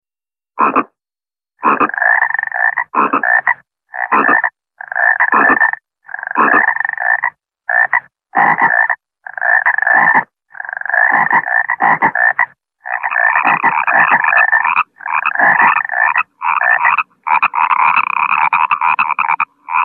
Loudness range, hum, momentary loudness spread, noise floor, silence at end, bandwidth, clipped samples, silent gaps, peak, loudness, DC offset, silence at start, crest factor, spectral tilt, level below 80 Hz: 2 LU; none; 10 LU; under -90 dBFS; 0 s; 4.3 kHz; under 0.1%; none; 0 dBFS; -12 LUFS; under 0.1%; 0.55 s; 14 dB; -7 dB/octave; -64 dBFS